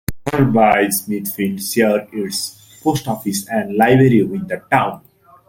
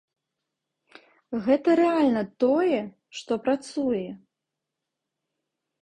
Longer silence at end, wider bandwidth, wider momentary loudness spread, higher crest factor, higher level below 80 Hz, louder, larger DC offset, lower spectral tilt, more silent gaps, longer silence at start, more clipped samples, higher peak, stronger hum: second, 0.5 s vs 1.65 s; first, 17 kHz vs 10 kHz; second, 11 LU vs 14 LU; about the same, 16 dB vs 18 dB; first, -46 dBFS vs -68 dBFS; first, -17 LUFS vs -24 LUFS; neither; about the same, -5.5 dB/octave vs -6 dB/octave; neither; second, 0.1 s vs 1.3 s; neither; first, -2 dBFS vs -8 dBFS; neither